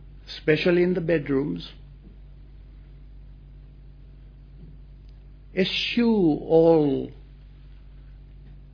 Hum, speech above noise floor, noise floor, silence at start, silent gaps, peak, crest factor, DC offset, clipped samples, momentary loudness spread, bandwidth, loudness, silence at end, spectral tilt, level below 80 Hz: none; 24 dB; -45 dBFS; 0 s; none; -6 dBFS; 20 dB; under 0.1%; under 0.1%; 16 LU; 5.4 kHz; -22 LUFS; 0.1 s; -7.5 dB/octave; -46 dBFS